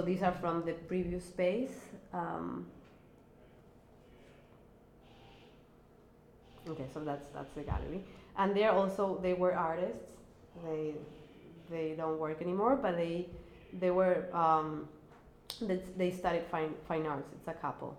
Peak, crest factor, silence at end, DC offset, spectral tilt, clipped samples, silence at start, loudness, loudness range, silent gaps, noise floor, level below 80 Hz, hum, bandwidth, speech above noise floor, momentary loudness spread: -16 dBFS; 20 dB; 0 s; under 0.1%; -7 dB/octave; under 0.1%; 0 s; -35 LUFS; 13 LU; none; -61 dBFS; -56 dBFS; none; 15.5 kHz; 26 dB; 17 LU